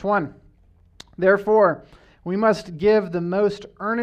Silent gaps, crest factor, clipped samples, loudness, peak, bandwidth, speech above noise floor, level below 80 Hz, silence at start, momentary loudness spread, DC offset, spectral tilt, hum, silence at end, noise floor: none; 18 dB; under 0.1%; -21 LUFS; -4 dBFS; 9.2 kHz; 35 dB; -54 dBFS; 0 s; 13 LU; under 0.1%; -7 dB/octave; none; 0 s; -55 dBFS